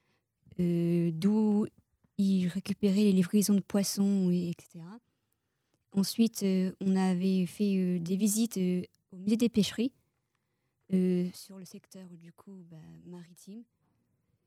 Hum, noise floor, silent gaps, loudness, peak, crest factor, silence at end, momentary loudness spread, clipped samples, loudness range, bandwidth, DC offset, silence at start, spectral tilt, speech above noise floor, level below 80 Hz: none; -80 dBFS; none; -29 LUFS; -16 dBFS; 14 dB; 0.85 s; 22 LU; under 0.1%; 8 LU; 15 kHz; under 0.1%; 0.6 s; -6 dB/octave; 50 dB; -70 dBFS